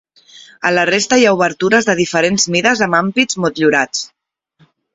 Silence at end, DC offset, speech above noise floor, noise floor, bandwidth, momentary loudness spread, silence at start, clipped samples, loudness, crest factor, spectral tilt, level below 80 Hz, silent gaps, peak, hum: 0.9 s; under 0.1%; 43 dB; -57 dBFS; 8 kHz; 6 LU; 0.35 s; under 0.1%; -13 LUFS; 16 dB; -3.5 dB/octave; -54 dBFS; none; 0 dBFS; none